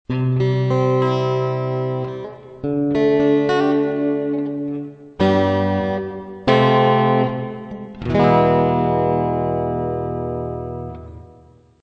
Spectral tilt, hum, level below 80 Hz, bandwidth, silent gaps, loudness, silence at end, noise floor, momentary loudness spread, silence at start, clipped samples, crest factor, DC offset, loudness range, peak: -8.5 dB/octave; none; -44 dBFS; 6.6 kHz; none; -19 LUFS; 0.5 s; -48 dBFS; 15 LU; 0.1 s; under 0.1%; 18 dB; under 0.1%; 3 LU; -2 dBFS